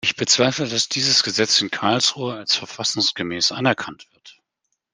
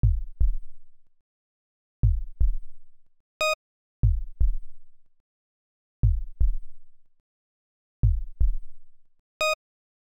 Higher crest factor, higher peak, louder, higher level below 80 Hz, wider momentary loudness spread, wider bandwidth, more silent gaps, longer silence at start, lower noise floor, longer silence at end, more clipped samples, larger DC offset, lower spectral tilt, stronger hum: about the same, 20 dB vs 16 dB; first, -2 dBFS vs -10 dBFS; first, -19 LUFS vs -28 LUFS; second, -64 dBFS vs -28 dBFS; about the same, 6 LU vs 6 LU; second, 10.5 kHz vs 16 kHz; second, none vs 1.21-2.03 s, 3.20-3.40 s, 3.54-4.03 s, 5.20-6.03 s, 7.20-8.03 s, 9.19-9.40 s; about the same, 0.05 s vs 0.05 s; second, -76 dBFS vs under -90 dBFS; first, 0.65 s vs 0.45 s; neither; neither; second, -2 dB/octave vs -5 dB/octave; neither